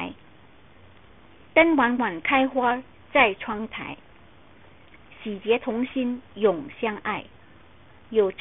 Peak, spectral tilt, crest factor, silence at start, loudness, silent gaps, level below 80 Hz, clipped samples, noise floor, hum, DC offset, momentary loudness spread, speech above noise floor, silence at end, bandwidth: -4 dBFS; -9 dB/octave; 22 dB; 0 s; -24 LUFS; none; -58 dBFS; under 0.1%; -53 dBFS; none; 0.2%; 15 LU; 30 dB; 0.05 s; 4 kHz